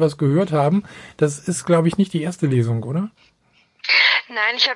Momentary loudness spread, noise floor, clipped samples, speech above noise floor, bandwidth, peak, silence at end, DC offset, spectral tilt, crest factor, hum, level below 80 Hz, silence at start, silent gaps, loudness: 12 LU; -59 dBFS; under 0.1%; 40 dB; 11.5 kHz; -2 dBFS; 0 s; under 0.1%; -5 dB/octave; 18 dB; none; -60 dBFS; 0 s; none; -19 LUFS